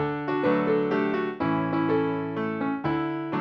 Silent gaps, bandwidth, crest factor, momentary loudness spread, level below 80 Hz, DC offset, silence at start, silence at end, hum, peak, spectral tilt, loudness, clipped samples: none; 6 kHz; 14 dB; 5 LU; -60 dBFS; under 0.1%; 0 s; 0 s; none; -12 dBFS; -9 dB/octave; -26 LUFS; under 0.1%